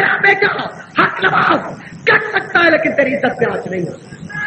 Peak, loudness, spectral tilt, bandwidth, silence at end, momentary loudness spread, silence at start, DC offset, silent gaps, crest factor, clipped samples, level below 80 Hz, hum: 0 dBFS; -14 LUFS; -5.5 dB/octave; 8.6 kHz; 0 s; 12 LU; 0 s; under 0.1%; none; 16 dB; under 0.1%; -56 dBFS; none